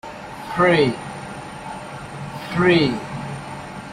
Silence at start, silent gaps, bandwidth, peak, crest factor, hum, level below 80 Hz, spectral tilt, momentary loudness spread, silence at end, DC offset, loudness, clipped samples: 0.05 s; none; 13 kHz; -4 dBFS; 18 dB; 50 Hz at -50 dBFS; -50 dBFS; -6 dB/octave; 17 LU; 0 s; under 0.1%; -20 LUFS; under 0.1%